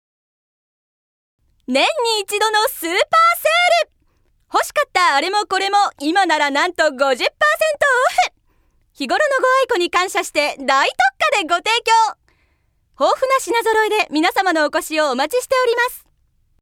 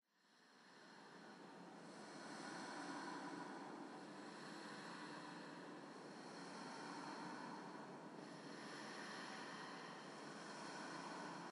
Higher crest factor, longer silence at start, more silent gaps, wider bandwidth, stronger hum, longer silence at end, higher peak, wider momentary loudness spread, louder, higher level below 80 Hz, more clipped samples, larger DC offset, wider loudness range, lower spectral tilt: about the same, 16 dB vs 16 dB; first, 1.7 s vs 0.2 s; neither; first, 19 kHz vs 11.5 kHz; neither; first, 0.65 s vs 0 s; first, -2 dBFS vs -38 dBFS; second, 5 LU vs 8 LU; first, -16 LUFS vs -54 LUFS; first, -58 dBFS vs under -90 dBFS; neither; neither; about the same, 2 LU vs 2 LU; second, -0.5 dB/octave vs -3.5 dB/octave